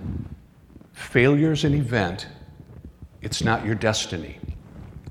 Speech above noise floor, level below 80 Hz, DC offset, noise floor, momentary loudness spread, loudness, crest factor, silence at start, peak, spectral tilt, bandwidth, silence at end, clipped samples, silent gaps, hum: 27 dB; -44 dBFS; under 0.1%; -49 dBFS; 23 LU; -23 LUFS; 22 dB; 0 s; -2 dBFS; -5.5 dB/octave; 14 kHz; 0 s; under 0.1%; none; none